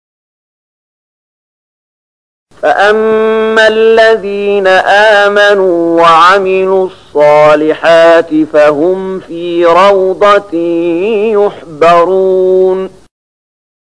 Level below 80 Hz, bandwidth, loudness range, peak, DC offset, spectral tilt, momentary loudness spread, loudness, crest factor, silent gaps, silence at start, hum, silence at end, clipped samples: -48 dBFS; 10.5 kHz; 4 LU; 0 dBFS; 0.7%; -5 dB/octave; 8 LU; -7 LUFS; 8 dB; none; 2.6 s; none; 1 s; 0.3%